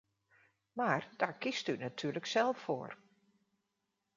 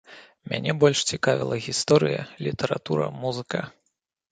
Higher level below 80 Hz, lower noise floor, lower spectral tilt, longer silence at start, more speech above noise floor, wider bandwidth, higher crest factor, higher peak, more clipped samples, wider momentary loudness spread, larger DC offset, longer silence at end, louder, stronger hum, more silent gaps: second, -82 dBFS vs -60 dBFS; first, -85 dBFS vs -77 dBFS; about the same, -4.5 dB/octave vs -4.5 dB/octave; first, 0.75 s vs 0.1 s; second, 49 dB vs 53 dB; second, 7.6 kHz vs 9.4 kHz; about the same, 24 dB vs 22 dB; second, -14 dBFS vs -4 dBFS; neither; about the same, 11 LU vs 11 LU; neither; first, 1.2 s vs 0.65 s; second, -36 LUFS vs -24 LUFS; neither; neither